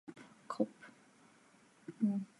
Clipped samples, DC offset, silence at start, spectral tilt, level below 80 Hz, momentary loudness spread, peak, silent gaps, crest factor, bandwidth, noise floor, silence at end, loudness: under 0.1%; under 0.1%; 0.1 s; -8 dB/octave; under -90 dBFS; 22 LU; -20 dBFS; none; 22 dB; 11.5 kHz; -66 dBFS; 0.15 s; -39 LUFS